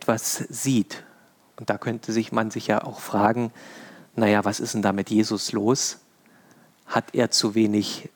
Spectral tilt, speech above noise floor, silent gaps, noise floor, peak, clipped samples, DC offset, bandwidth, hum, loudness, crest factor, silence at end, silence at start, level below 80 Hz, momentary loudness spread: -4 dB/octave; 33 dB; none; -56 dBFS; -6 dBFS; under 0.1%; under 0.1%; over 20 kHz; none; -24 LUFS; 20 dB; 0.1 s; 0 s; -72 dBFS; 12 LU